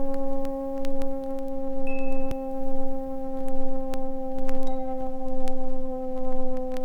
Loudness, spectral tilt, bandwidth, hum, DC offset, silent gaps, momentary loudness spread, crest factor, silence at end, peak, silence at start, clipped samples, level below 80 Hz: -32 LUFS; -8 dB/octave; 2.8 kHz; none; under 0.1%; none; 2 LU; 10 dB; 0 s; -10 dBFS; 0 s; under 0.1%; -30 dBFS